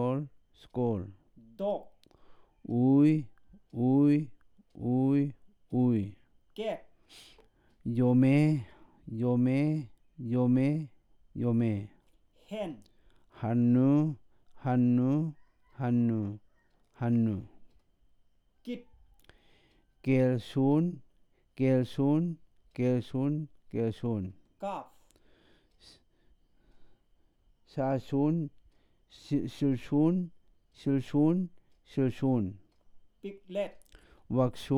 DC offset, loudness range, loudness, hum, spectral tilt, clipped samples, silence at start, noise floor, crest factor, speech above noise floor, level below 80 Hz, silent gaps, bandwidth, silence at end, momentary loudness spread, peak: under 0.1%; 8 LU; -30 LUFS; none; -9.5 dB/octave; under 0.1%; 0 s; -67 dBFS; 18 dB; 39 dB; -64 dBFS; none; 10.5 kHz; 0 s; 18 LU; -14 dBFS